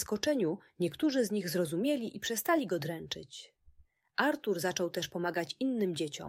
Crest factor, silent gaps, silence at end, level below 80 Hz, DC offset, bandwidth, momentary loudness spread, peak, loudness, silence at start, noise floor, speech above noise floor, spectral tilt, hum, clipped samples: 18 dB; none; 0 s; -70 dBFS; under 0.1%; 16 kHz; 8 LU; -14 dBFS; -33 LUFS; 0 s; -64 dBFS; 31 dB; -4.5 dB/octave; none; under 0.1%